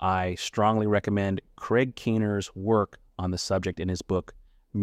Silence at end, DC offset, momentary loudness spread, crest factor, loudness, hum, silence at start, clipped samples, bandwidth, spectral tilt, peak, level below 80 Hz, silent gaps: 0 s; under 0.1%; 8 LU; 16 dB; -27 LUFS; none; 0 s; under 0.1%; 14 kHz; -6 dB/octave; -10 dBFS; -52 dBFS; none